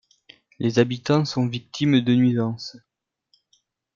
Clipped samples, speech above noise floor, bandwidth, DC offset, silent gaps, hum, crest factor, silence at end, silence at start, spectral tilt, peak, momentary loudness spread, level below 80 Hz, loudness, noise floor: under 0.1%; 46 dB; 7.4 kHz; under 0.1%; none; none; 20 dB; 1.2 s; 0.6 s; -6.5 dB/octave; -4 dBFS; 9 LU; -64 dBFS; -22 LUFS; -67 dBFS